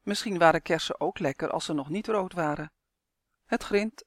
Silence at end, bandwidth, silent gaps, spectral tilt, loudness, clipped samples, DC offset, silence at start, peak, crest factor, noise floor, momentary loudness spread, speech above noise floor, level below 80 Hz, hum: 0.05 s; 15.5 kHz; none; -4.5 dB/octave; -28 LUFS; under 0.1%; under 0.1%; 0.05 s; -6 dBFS; 22 dB; -83 dBFS; 10 LU; 55 dB; -58 dBFS; none